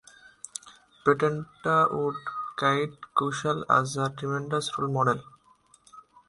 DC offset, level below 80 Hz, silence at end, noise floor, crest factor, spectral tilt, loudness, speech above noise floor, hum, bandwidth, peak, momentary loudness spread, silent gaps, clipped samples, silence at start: under 0.1%; -66 dBFS; 0.3 s; -61 dBFS; 20 dB; -5 dB/octave; -27 LUFS; 35 dB; none; 11.5 kHz; -8 dBFS; 11 LU; none; under 0.1%; 0.65 s